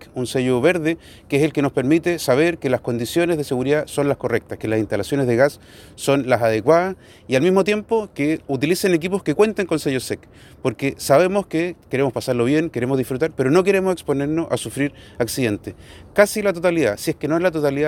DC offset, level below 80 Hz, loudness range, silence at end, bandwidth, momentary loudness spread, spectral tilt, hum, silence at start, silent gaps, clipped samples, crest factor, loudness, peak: under 0.1%; -52 dBFS; 2 LU; 0 s; 18 kHz; 8 LU; -5.5 dB/octave; none; 0 s; none; under 0.1%; 18 dB; -20 LUFS; 0 dBFS